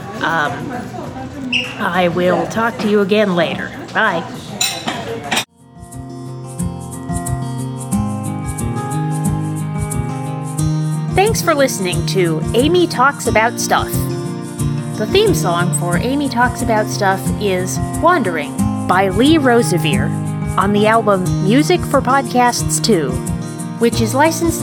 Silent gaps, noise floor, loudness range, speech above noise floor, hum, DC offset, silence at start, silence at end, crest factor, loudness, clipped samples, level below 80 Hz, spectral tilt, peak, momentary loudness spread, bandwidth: none; -38 dBFS; 7 LU; 23 dB; none; under 0.1%; 0 s; 0 s; 16 dB; -16 LUFS; under 0.1%; -36 dBFS; -5 dB/octave; 0 dBFS; 11 LU; 19.5 kHz